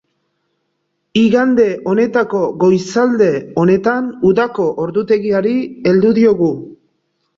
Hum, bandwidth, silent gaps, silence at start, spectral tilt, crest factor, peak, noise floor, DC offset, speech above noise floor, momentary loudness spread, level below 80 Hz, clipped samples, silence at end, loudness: none; 7.8 kHz; none; 1.15 s; -7 dB/octave; 14 dB; -2 dBFS; -69 dBFS; under 0.1%; 56 dB; 6 LU; -54 dBFS; under 0.1%; 0.65 s; -14 LUFS